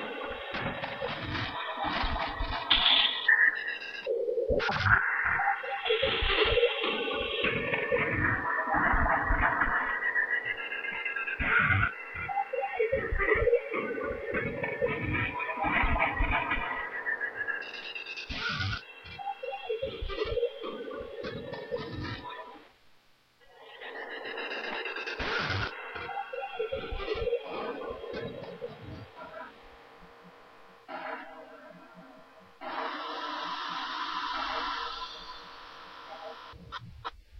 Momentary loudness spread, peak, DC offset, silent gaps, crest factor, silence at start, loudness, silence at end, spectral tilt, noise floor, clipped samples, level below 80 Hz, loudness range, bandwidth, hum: 18 LU; -6 dBFS; under 0.1%; none; 24 dB; 0 s; -30 LUFS; 0 s; -5.5 dB/octave; -62 dBFS; under 0.1%; -44 dBFS; 15 LU; 7 kHz; none